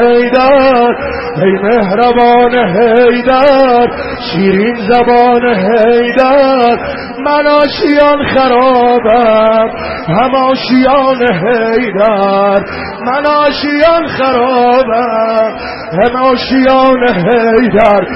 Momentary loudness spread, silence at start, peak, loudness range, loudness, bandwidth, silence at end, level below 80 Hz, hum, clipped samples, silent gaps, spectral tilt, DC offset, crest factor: 6 LU; 0 s; 0 dBFS; 2 LU; -9 LUFS; 5.8 kHz; 0 s; -36 dBFS; none; 0.2%; none; -8 dB/octave; under 0.1%; 8 dB